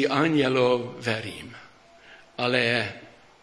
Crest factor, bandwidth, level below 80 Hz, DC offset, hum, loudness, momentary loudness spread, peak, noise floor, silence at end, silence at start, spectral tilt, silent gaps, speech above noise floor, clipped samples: 20 dB; 11 kHz; -64 dBFS; under 0.1%; none; -24 LUFS; 20 LU; -6 dBFS; -51 dBFS; 0.35 s; 0 s; -5.5 dB/octave; none; 27 dB; under 0.1%